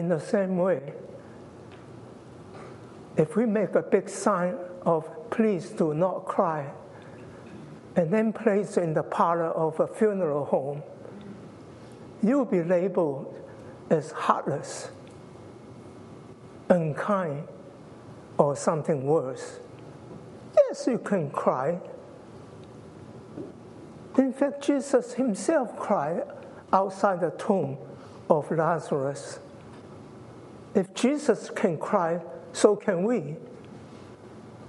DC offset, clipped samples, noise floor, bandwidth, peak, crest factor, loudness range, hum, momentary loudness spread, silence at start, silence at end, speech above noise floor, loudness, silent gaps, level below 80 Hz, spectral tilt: under 0.1%; under 0.1%; -46 dBFS; 11.5 kHz; -4 dBFS; 24 dB; 5 LU; none; 22 LU; 0 s; 0 s; 20 dB; -26 LUFS; none; -70 dBFS; -6.5 dB/octave